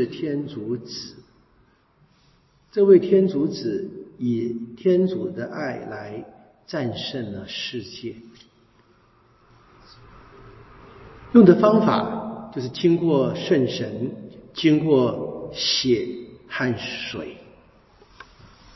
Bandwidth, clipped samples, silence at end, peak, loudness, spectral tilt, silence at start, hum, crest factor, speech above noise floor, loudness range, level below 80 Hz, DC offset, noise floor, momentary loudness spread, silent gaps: 6 kHz; under 0.1%; 1.4 s; -2 dBFS; -22 LUFS; -6.5 dB/octave; 0 s; none; 22 dB; 38 dB; 13 LU; -58 dBFS; under 0.1%; -60 dBFS; 19 LU; none